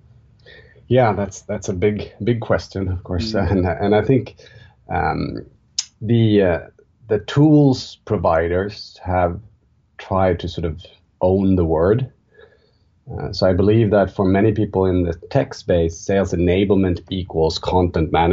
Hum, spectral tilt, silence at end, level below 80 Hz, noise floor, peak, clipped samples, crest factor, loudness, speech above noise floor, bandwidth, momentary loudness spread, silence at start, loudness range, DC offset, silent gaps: none; -7 dB/octave; 0 s; -38 dBFS; -58 dBFS; -4 dBFS; under 0.1%; 14 dB; -19 LUFS; 40 dB; 7.8 kHz; 11 LU; 0.9 s; 4 LU; under 0.1%; none